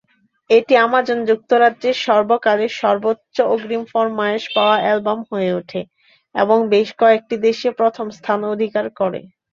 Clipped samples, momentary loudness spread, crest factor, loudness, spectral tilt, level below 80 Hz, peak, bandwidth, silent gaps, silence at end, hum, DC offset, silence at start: under 0.1%; 8 LU; 16 dB; -17 LUFS; -5.5 dB/octave; -66 dBFS; -2 dBFS; 7.2 kHz; none; 0.3 s; none; under 0.1%; 0.5 s